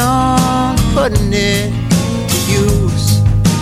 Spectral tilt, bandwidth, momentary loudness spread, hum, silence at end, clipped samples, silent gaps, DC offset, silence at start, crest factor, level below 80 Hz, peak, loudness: -5 dB/octave; 16 kHz; 3 LU; none; 0 s; under 0.1%; none; under 0.1%; 0 s; 12 dB; -22 dBFS; 0 dBFS; -13 LUFS